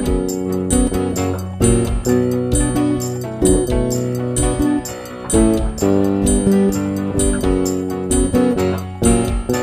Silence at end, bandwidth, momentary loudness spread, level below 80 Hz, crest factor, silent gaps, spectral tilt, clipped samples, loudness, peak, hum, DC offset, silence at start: 0 s; 15.5 kHz; 6 LU; -26 dBFS; 16 dB; none; -5.5 dB/octave; under 0.1%; -17 LUFS; 0 dBFS; none; under 0.1%; 0 s